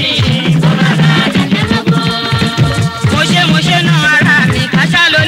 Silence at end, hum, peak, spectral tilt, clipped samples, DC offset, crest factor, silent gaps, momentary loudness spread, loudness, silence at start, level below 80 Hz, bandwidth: 0 s; none; 0 dBFS; -5 dB/octave; under 0.1%; under 0.1%; 10 dB; none; 5 LU; -10 LUFS; 0 s; -34 dBFS; 15 kHz